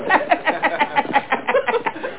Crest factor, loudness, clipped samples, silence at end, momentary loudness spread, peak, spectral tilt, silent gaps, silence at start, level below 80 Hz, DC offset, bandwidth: 16 dB; -19 LUFS; under 0.1%; 0 s; 3 LU; -4 dBFS; -7 dB/octave; none; 0 s; -62 dBFS; 0.9%; 4 kHz